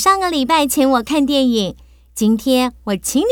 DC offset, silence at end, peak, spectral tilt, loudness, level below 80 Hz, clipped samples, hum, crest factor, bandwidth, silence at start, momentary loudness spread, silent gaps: under 0.1%; 0 s; -2 dBFS; -3.5 dB/octave; -16 LUFS; -44 dBFS; under 0.1%; none; 14 dB; over 20 kHz; 0 s; 6 LU; none